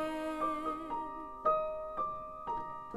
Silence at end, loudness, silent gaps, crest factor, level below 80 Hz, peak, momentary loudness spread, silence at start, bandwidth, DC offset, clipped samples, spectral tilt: 0 s; -37 LUFS; none; 18 dB; -60 dBFS; -18 dBFS; 8 LU; 0 s; 15 kHz; under 0.1%; under 0.1%; -5.5 dB/octave